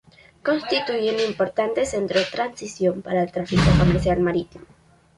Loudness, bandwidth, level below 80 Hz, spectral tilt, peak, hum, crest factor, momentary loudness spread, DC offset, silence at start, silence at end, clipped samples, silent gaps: -22 LUFS; 11.5 kHz; -36 dBFS; -6 dB/octave; -4 dBFS; none; 18 dB; 9 LU; under 0.1%; 0.45 s; 0.55 s; under 0.1%; none